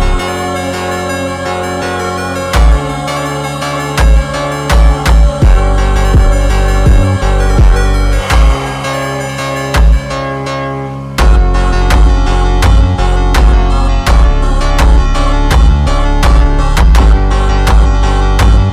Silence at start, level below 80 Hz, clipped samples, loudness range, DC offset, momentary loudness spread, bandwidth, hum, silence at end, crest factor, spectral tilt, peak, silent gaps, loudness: 0 s; -10 dBFS; under 0.1%; 3 LU; under 0.1%; 7 LU; 13 kHz; none; 0 s; 8 dB; -5.5 dB/octave; 0 dBFS; none; -11 LUFS